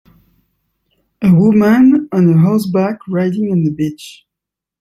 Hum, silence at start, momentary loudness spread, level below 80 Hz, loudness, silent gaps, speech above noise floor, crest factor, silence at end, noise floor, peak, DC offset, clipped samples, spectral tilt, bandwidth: none; 1.2 s; 8 LU; -52 dBFS; -13 LUFS; none; 71 dB; 12 dB; 0.7 s; -83 dBFS; -2 dBFS; under 0.1%; under 0.1%; -8.5 dB/octave; 14 kHz